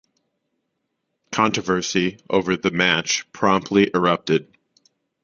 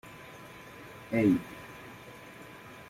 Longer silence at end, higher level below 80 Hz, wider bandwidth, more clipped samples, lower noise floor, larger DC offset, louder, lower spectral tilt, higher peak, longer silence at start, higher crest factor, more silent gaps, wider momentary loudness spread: first, 0.8 s vs 0.05 s; first, -56 dBFS vs -64 dBFS; second, 7.4 kHz vs 16 kHz; neither; first, -76 dBFS vs -49 dBFS; neither; first, -20 LUFS vs -29 LUFS; second, -4 dB/octave vs -7 dB/octave; first, -2 dBFS vs -14 dBFS; first, 1.3 s vs 0.05 s; about the same, 20 dB vs 22 dB; neither; second, 5 LU vs 21 LU